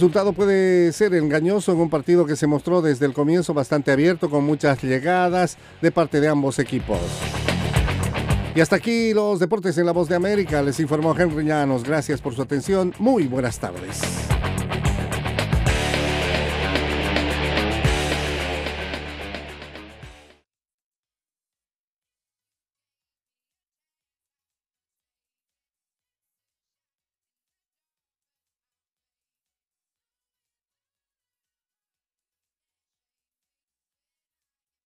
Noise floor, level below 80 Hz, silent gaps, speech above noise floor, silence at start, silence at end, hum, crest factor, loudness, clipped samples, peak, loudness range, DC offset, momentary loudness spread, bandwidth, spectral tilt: under -90 dBFS; -36 dBFS; none; over 70 dB; 0 s; 14.75 s; none; 20 dB; -21 LUFS; under 0.1%; -4 dBFS; 6 LU; under 0.1%; 7 LU; 15.5 kHz; -6 dB/octave